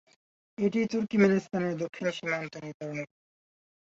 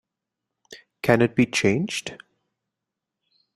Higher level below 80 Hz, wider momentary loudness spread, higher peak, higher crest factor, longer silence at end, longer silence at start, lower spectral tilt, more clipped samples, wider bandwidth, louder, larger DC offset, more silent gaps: second, -70 dBFS vs -60 dBFS; first, 16 LU vs 11 LU; second, -10 dBFS vs -2 dBFS; about the same, 22 dB vs 24 dB; second, 0.9 s vs 1.4 s; about the same, 0.6 s vs 0.7 s; first, -6.5 dB/octave vs -5 dB/octave; neither; second, 7.6 kHz vs 14 kHz; second, -30 LUFS vs -22 LUFS; neither; first, 2.74-2.80 s vs none